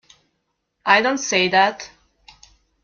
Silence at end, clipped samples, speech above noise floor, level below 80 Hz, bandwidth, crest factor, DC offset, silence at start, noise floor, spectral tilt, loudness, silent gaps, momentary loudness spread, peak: 0.95 s; under 0.1%; 56 dB; -62 dBFS; 7.4 kHz; 20 dB; under 0.1%; 0.85 s; -73 dBFS; -2.5 dB/octave; -17 LUFS; none; 18 LU; -2 dBFS